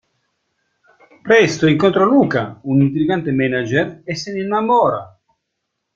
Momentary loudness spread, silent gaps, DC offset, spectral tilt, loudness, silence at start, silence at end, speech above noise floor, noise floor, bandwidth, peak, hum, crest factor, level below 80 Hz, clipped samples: 10 LU; none; under 0.1%; -6.5 dB/octave; -16 LUFS; 1.25 s; 0.9 s; 60 dB; -75 dBFS; 7.6 kHz; -2 dBFS; none; 16 dB; -56 dBFS; under 0.1%